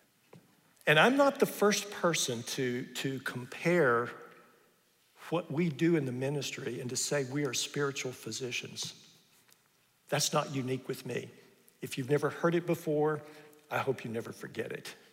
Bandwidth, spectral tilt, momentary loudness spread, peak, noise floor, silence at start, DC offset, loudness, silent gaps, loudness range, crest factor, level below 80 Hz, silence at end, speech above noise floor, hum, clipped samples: 16 kHz; -4 dB/octave; 13 LU; -10 dBFS; -70 dBFS; 0.35 s; under 0.1%; -32 LUFS; none; 7 LU; 24 dB; -80 dBFS; 0.2 s; 38 dB; none; under 0.1%